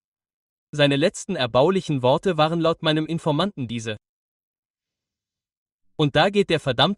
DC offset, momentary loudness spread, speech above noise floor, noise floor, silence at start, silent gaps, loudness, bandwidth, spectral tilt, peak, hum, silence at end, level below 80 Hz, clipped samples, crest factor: under 0.1%; 11 LU; 69 dB; -89 dBFS; 0.75 s; 4.09-4.74 s, 5.57-5.66 s, 5.72-5.79 s; -21 LUFS; 11.5 kHz; -5.5 dB/octave; -4 dBFS; none; 0 s; -56 dBFS; under 0.1%; 20 dB